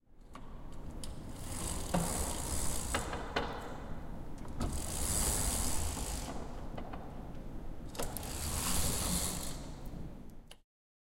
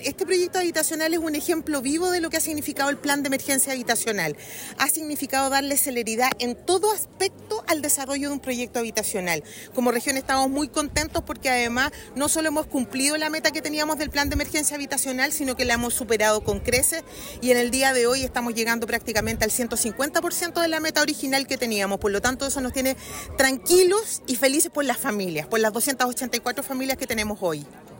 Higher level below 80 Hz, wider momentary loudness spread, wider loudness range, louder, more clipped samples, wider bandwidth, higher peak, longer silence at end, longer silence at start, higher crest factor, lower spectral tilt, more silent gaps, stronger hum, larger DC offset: about the same, -42 dBFS vs -46 dBFS; first, 16 LU vs 6 LU; about the same, 2 LU vs 3 LU; second, -38 LUFS vs -23 LUFS; neither; about the same, 16.5 kHz vs 17 kHz; second, -16 dBFS vs -6 dBFS; first, 0.6 s vs 0 s; about the same, 0.1 s vs 0 s; about the same, 20 dB vs 18 dB; about the same, -3.5 dB/octave vs -2.5 dB/octave; neither; neither; neither